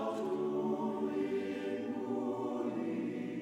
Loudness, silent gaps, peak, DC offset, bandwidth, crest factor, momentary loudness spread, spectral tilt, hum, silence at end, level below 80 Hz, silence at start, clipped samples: -37 LUFS; none; -24 dBFS; under 0.1%; 11 kHz; 12 dB; 3 LU; -7 dB/octave; none; 0 s; -78 dBFS; 0 s; under 0.1%